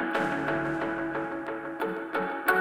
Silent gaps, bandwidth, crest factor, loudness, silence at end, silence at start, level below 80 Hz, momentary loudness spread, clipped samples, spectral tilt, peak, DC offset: none; 16.5 kHz; 20 dB; -30 LUFS; 0 s; 0 s; -60 dBFS; 6 LU; under 0.1%; -5.5 dB/octave; -10 dBFS; under 0.1%